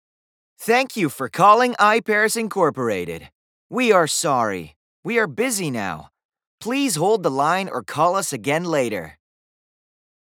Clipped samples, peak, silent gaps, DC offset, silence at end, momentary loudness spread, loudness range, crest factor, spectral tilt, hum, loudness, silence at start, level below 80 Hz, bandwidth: under 0.1%; -2 dBFS; 3.32-3.70 s, 4.76-5.03 s, 6.25-6.29 s, 6.47-6.58 s; under 0.1%; 1.1 s; 15 LU; 4 LU; 20 dB; -4 dB/octave; none; -20 LUFS; 0.6 s; -62 dBFS; 19.5 kHz